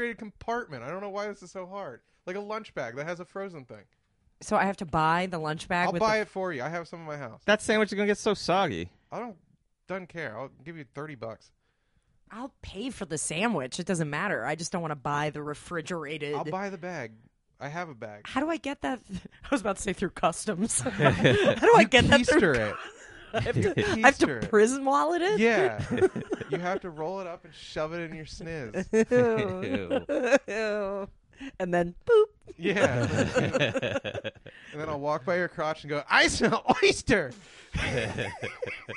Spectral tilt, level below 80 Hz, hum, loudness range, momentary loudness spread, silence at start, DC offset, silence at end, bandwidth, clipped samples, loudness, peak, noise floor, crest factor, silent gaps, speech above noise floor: -4.5 dB/octave; -52 dBFS; none; 13 LU; 18 LU; 0 s; under 0.1%; 0 s; 11.5 kHz; under 0.1%; -27 LUFS; -4 dBFS; -71 dBFS; 24 dB; none; 43 dB